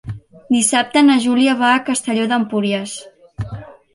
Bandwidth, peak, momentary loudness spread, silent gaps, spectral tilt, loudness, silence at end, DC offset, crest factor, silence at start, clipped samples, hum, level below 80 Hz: 11.5 kHz; -2 dBFS; 19 LU; none; -3.5 dB/octave; -15 LUFS; 0.25 s; under 0.1%; 14 dB; 0.05 s; under 0.1%; none; -48 dBFS